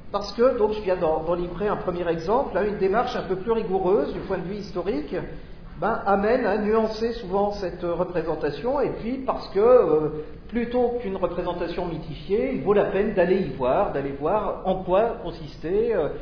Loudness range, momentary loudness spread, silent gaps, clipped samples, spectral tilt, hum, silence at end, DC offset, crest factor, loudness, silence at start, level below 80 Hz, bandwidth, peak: 2 LU; 9 LU; none; under 0.1%; -7.5 dB/octave; none; 0 s; under 0.1%; 18 dB; -24 LUFS; 0 s; -42 dBFS; 5.4 kHz; -6 dBFS